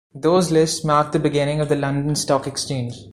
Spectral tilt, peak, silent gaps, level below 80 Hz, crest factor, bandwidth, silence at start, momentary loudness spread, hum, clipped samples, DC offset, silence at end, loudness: -5 dB/octave; -4 dBFS; none; -50 dBFS; 16 dB; 15 kHz; 0.15 s; 8 LU; none; under 0.1%; under 0.1%; 0 s; -20 LUFS